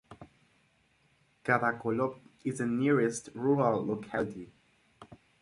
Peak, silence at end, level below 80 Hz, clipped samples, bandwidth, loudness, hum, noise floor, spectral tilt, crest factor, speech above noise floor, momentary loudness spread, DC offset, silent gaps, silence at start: -12 dBFS; 0.25 s; -68 dBFS; under 0.1%; 11.5 kHz; -31 LUFS; none; -69 dBFS; -6.5 dB/octave; 22 dB; 39 dB; 12 LU; under 0.1%; none; 0.1 s